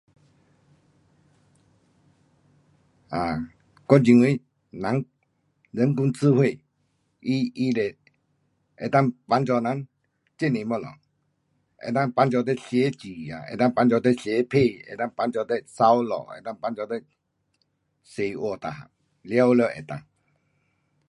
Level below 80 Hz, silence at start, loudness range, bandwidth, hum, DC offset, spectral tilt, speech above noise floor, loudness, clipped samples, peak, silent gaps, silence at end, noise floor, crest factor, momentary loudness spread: -62 dBFS; 3.1 s; 4 LU; 11.5 kHz; none; under 0.1%; -7.5 dB/octave; 50 dB; -24 LUFS; under 0.1%; -2 dBFS; none; 1.1 s; -72 dBFS; 24 dB; 17 LU